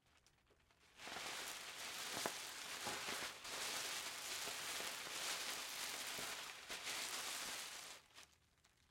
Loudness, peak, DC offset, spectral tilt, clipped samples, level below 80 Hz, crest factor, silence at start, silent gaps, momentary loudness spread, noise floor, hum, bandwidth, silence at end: -46 LUFS; -24 dBFS; under 0.1%; 0.5 dB/octave; under 0.1%; -82 dBFS; 26 dB; 0.15 s; none; 6 LU; -75 dBFS; none; 16.5 kHz; 0.25 s